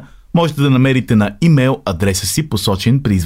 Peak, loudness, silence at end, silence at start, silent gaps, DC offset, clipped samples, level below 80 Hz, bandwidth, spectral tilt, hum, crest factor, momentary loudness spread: -2 dBFS; -14 LUFS; 0 s; 0 s; none; 0.2%; under 0.1%; -38 dBFS; 16.5 kHz; -5.5 dB/octave; none; 12 dB; 5 LU